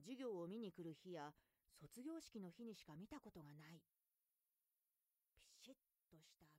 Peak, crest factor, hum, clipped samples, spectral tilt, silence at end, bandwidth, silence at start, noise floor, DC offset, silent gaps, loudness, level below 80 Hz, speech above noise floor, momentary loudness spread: -42 dBFS; 16 dB; none; under 0.1%; -5.5 dB/octave; 0 s; 15.5 kHz; 0 s; under -90 dBFS; under 0.1%; none; -57 LUFS; -86 dBFS; over 34 dB; 15 LU